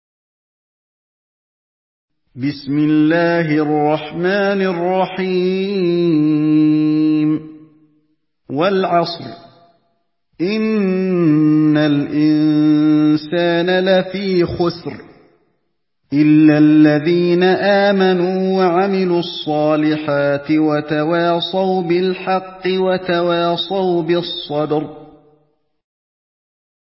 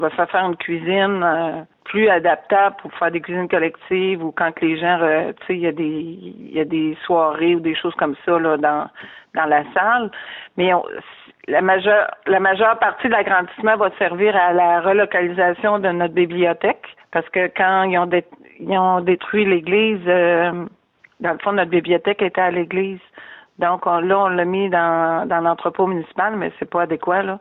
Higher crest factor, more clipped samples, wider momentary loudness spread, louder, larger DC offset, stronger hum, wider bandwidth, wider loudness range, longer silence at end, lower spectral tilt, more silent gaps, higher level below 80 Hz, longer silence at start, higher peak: about the same, 16 dB vs 14 dB; neither; about the same, 8 LU vs 9 LU; first, -15 LUFS vs -18 LUFS; neither; neither; first, 5.8 kHz vs 4.1 kHz; about the same, 6 LU vs 4 LU; first, 1.8 s vs 0 s; first, -11 dB/octave vs -3.5 dB/octave; neither; first, -54 dBFS vs -62 dBFS; first, 2.35 s vs 0 s; first, 0 dBFS vs -4 dBFS